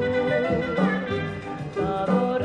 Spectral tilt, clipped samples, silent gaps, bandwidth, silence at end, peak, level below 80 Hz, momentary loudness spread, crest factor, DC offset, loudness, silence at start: -7.5 dB/octave; under 0.1%; none; 9.2 kHz; 0 s; -10 dBFS; -50 dBFS; 8 LU; 14 dB; under 0.1%; -25 LUFS; 0 s